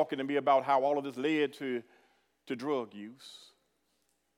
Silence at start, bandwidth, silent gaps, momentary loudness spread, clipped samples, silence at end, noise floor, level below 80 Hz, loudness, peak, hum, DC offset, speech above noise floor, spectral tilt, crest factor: 0 s; 15 kHz; none; 20 LU; under 0.1%; 1 s; -77 dBFS; under -90 dBFS; -31 LUFS; -14 dBFS; none; under 0.1%; 45 dB; -5.5 dB/octave; 20 dB